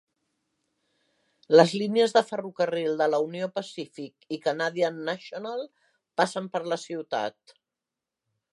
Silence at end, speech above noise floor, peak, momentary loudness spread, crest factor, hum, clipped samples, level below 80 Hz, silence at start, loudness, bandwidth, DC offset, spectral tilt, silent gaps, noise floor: 1.2 s; 62 dB; -2 dBFS; 16 LU; 24 dB; none; under 0.1%; -84 dBFS; 1.5 s; -26 LUFS; 11.5 kHz; under 0.1%; -5 dB/octave; none; -88 dBFS